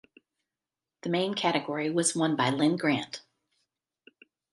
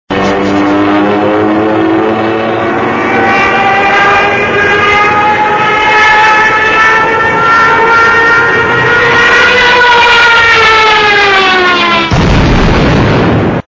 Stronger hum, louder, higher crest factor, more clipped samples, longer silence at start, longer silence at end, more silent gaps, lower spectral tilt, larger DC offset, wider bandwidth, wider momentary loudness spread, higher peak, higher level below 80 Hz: neither; second, -27 LUFS vs -6 LUFS; first, 20 dB vs 6 dB; second, under 0.1% vs 0.7%; first, 1.05 s vs 0.1 s; first, 1.35 s vs 0.05 s; neither; about the same, -4 dB/octave vs -5 dB/octave; neither; first, 11.5 kHz vs 8 kHz; first, 11 LU vs 6 LU; second, -10 dBFS vs 0 dBFS; second, -78 dBFS vs -24 dBFS